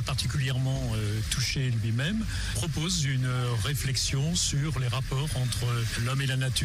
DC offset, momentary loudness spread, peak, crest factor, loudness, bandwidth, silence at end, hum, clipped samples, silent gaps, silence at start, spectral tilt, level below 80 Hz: under 0.1%; 3 LU; -16 dBFS; 12 dB; -28 LUFS; 15.5 kHz; 0 s; none; under 0.1%; none; 0 s; -4 dB/octave; -40 dBFS